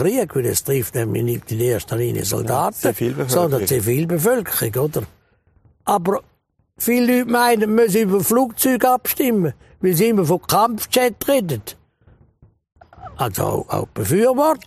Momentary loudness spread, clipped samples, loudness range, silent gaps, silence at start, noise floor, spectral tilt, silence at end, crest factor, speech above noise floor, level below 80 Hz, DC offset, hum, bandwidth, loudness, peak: 8 LU; under 0.1%; 5 LU; none; 0 s; -57 dBFS; -5 dB/octave; 0.1 s; 16 dB; 39 dB; -50 dBFS; under 0.1%; none; 15.5 kHz; -19 LUFS; -2 dBFS